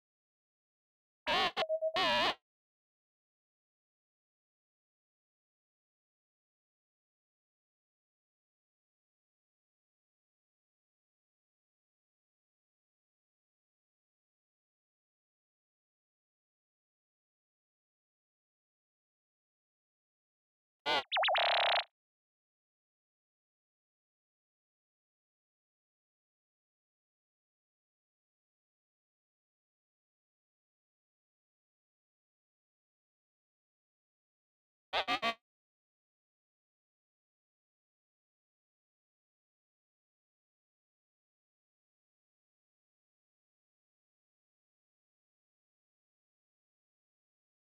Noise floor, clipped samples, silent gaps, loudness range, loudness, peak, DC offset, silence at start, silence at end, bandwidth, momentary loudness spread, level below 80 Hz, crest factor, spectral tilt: under -90 dBFS; under 0.1%; 2.42-20.85 s, 21.91-34.92 s; 8 LU; -32 LUFS; -28 dBFS; under 0.1%; 1.25 s; 12.3 s; 1.3 kHz; 13 LU; -80 dBFS; 18 dB; 6 dB/octave